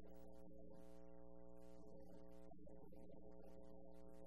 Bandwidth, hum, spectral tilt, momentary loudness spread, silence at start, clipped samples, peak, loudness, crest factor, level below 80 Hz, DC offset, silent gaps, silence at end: 13 kHz; none; -8 dB/octave; 1 LU; 0 s; under 0.1%; -46 dBFS; -64 LUFS; 12 dB; -72 dBFS; 0.2%; none; 0 s